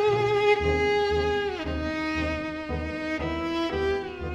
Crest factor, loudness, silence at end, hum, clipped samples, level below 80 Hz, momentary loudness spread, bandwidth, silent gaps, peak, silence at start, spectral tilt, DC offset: 16 dB; -26 LUFS; 0 s; none; under 0.1%; -40 dBFS; 9 LU; 9.4 kHz; none; -10 dBFS; 0 s; -6 dB/octave; under 0.1%